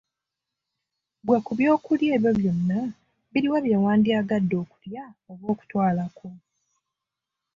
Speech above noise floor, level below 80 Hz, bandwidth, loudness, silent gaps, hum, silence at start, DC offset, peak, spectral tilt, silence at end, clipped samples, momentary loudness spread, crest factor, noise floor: 63 dB; -62 dBFS; 7.2 kHz; -23 LUFS; none; none; 1.25 s; under 0.1%; -8 dBFS; -8.5 dB/octave; 1.2 s; under 0.1%; 17 LU; 18 dB; -86 dBFS